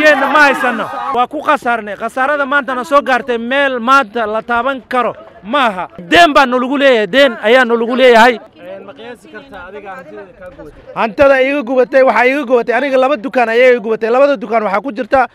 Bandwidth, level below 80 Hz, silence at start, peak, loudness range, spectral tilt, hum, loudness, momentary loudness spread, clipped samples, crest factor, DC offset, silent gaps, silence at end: 15 kHz; -48 dBFS; 0 s; 0 dBFS; 5 LU; -4 dB/octave; none; -11 LUFS; 21 LU; 0.3%; 12 dB; under 0.1%; none; 0.1 s